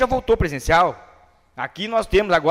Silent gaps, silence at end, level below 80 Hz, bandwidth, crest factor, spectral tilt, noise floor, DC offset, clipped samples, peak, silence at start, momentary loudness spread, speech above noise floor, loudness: none; 0 s; -34 dBFS; 15.5 kHz; 16 dB; -5 dB/octave; -52 dBFS; under 0.1%; under 0.1%; -4 dBFS; 0 s; 13 LU; 33 dB; -19 LUFS